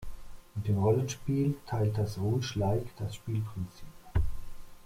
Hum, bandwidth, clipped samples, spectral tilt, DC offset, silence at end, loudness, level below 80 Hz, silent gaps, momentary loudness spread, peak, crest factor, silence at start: none; 15.5 kHz; under 0.1%; -7 dB/octave; under 0.1%; 0.05 s; -32 LUFS; -44 dBFS; none; 13 LU; -14 dBFS; 16 dB; 0 s